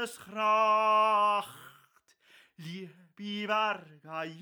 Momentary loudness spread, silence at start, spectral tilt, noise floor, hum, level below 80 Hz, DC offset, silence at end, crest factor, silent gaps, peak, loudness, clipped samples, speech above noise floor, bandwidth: 20 LU; 0 s; -4 dB/octave; -66 dBFS; none; -88 dBFS; under 0.1%; 0 s; 16 dB; none; -16 dBFS; -28 LUFS; under 0.1%; 36 dB; over 20 kHz